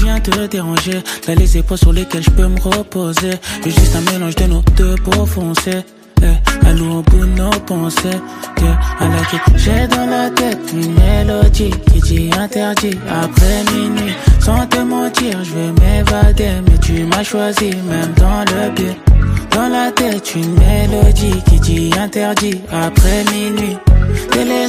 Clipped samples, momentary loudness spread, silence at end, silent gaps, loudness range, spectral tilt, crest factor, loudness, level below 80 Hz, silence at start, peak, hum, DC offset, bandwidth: under 0.1%; 5 LU; 0 s; none; 2 LU; -5.5 dB/octave; 12 dB; -13 LUFS; -14 dBFS; 0 s; 0 dBFS; none; under 0.1%; 15.5 kHz